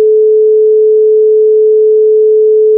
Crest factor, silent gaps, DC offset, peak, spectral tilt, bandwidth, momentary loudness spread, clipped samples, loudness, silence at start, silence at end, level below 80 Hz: 4 dB; none; under 0.1%; -2 dBFS; -11.5 dB/octave; 0.6 kHz; 0 LU; under 0.1%; -7 LUFS; 0 s; 0 s; -86 dBFS